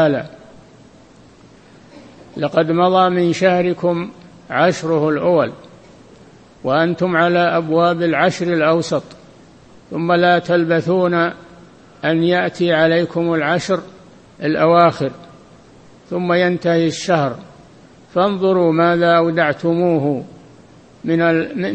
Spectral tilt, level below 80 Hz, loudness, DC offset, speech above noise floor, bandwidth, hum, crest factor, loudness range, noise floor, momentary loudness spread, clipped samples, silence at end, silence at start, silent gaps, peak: -6.5 dB/octave; -58 dBFS; -16 LUFS; under 0.1%; 30 dB; 8.6 kHz; none; 18 dB; 3 LU; -45 dBFS; 10 LU; under 0.1%; 0 s; 0 s; none; 0 dBFS